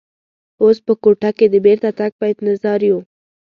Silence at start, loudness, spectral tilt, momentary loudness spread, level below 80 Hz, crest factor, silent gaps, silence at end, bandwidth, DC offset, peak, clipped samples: 0.6 s; -15 LUFS; -8.5 dB/octave; 7 LU; -62 dBFS; 14 dB; 2.12-2.19 s; 0.35 s; 5.6 kHz; under 0.1%; 0 dBFS; under 0.1%